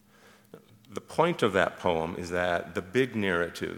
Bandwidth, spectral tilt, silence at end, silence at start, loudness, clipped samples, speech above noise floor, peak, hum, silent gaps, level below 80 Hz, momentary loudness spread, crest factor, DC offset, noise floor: 18.5 kHz; -5.5 dB/octave; 0 s; 0.55 s; -28 LUFS; under 0.1%; 30 dB; -8 dBFS; none; none; -60 dBFS; 7 LU; 22 dB; under 0.1%; -58 dBFS